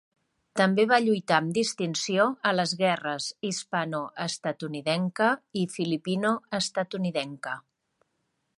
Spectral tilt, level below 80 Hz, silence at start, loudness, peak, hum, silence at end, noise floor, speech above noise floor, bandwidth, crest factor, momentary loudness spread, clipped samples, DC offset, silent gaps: -4.5 dB/octave; -74 dBFS; 0.55 s; -27 LUFS; -6 dBFS; none; 1 s; -77 dBFS; 50 dB; 11.5 kHz; 22 dB; 9 LU; under 0.1%; under 0.1%; none